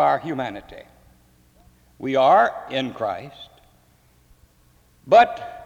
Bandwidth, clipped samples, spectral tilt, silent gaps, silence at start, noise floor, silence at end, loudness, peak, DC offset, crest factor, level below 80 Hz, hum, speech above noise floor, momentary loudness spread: 7.8 kHz; under 0.1%; -5.5 dB/octave; none; 0 s; -57 dBFS; 0 s; -20 LUFS; -4 dBFS; under 0.1%; 20 dB; -58 dBFS; none; 37 dB; 18 LU